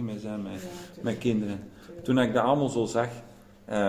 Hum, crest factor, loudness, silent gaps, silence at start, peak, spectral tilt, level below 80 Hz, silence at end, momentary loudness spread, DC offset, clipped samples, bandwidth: none; 18 dB; -28 LUFS; none; 0 s; -10 dBFS; -6 dB/octave; -58 dBFS; 0 s; 15 LU; under 0.1%; under 0.1%; 16 kHz